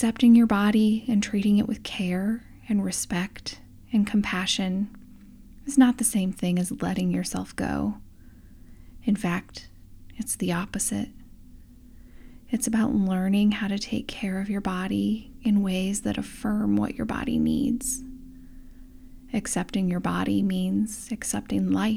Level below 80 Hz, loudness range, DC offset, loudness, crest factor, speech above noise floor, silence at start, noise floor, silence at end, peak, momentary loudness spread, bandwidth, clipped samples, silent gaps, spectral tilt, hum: -48 dBFS; 5 LU; under 0.1%; -25 LUFS; 20 dB; 23 dB; 0 s; -48 dBFS; 0 s; -6 dBFS; 11 LU; 16 kHz; under 0.1%; none; -5 dB/octave; none